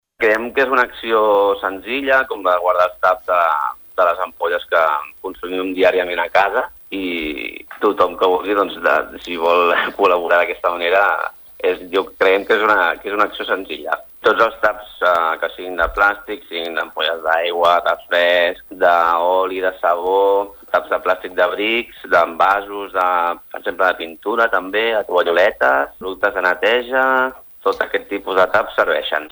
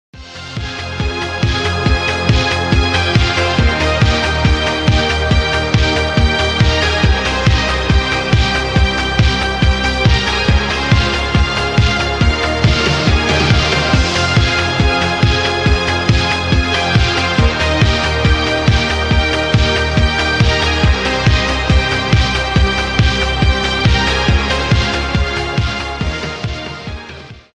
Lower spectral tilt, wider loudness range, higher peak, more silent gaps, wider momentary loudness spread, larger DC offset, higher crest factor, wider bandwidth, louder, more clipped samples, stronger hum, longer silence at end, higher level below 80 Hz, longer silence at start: about the same, -4 dB/octave vs -5 dB/octave; about the same, 2 LU vs 1 LU; about the same, -2 dBFS vs 0 dBFS; neither; first, 8 LU vs 5 LU; neither; about the same, 16 dB vs 12 dB; first, over 20 kHz vs 10 kHz; second, -17 LUFS vs -14 LUFS; neither; neither; about the same, 0.05 s vs 0.15 s; second, -48 dBFS vs -20 dBFS; about the same, 0.2 s vs 0.15 s